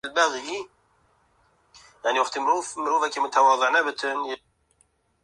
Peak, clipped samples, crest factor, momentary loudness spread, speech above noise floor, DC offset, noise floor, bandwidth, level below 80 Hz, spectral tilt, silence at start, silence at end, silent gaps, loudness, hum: -6 dBFS; under 0.1%; 20 dB; 14 LU; 43 dB; under 0.1%; -66 dBFS; 11.5 kHz; -72 dBFS; -0.5 dB/octave; 0.05 s; 0.85 s; none; -24 LUFS; none